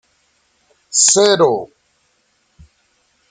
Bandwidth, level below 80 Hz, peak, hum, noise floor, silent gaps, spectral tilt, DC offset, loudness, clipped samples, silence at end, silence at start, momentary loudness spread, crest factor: 9.6 kHz; -60 dBFS; 0 dBFS; none; -62 dBFS; none; -1.5 dB/octave; under 0.1%; -12 LUFS; under 0.1%; 1.65 s; 0.95 s; 14 LU; 18 dB